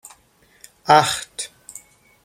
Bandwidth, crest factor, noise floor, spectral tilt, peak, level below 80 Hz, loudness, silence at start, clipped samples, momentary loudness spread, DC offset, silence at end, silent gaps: 16 kHz; 22 dB; -57 dBFS; -2.5 dB/octave; -2 dBFS; -60 dBFS; -18 LUFS; 0.85 s; under 0.1%; 25 LU; under 0.1%; 0.8 s; none